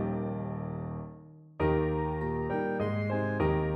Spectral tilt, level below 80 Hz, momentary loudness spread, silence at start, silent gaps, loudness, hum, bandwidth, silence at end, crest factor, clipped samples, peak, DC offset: -10 dB/octave; -44 dBFS; 12 LU; 0 s; none; -32 LUFS; none; 5.6 kHz; 0 s; 16 dB; under 0.1%; -16 dBFS; under 0.1%